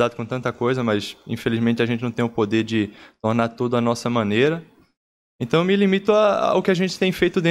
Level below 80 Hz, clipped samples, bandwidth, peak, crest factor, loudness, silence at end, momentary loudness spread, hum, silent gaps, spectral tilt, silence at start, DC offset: -56 dBFS; under 0.1%; 14.5 kHz; -6 dBFS; 14 dB; -21 LUFS; 0 s; 9 LU; none; 4.97-5.39 s; -6.5 dB/octave; 0 s; under 0.1%